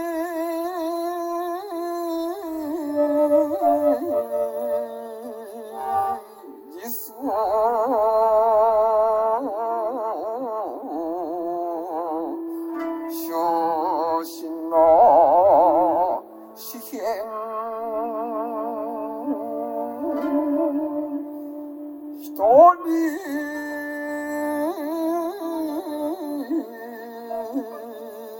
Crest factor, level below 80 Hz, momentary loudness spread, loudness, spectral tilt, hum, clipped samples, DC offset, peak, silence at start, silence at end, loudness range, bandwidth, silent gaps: 20 dB; -60 dBFS; 18 LU; -23 LUFS; -5 dB/octave; none; under 0.1%; under 0.1%; -2 dBFS; 0 s; 0 s; 9 LU; 19 kHz; none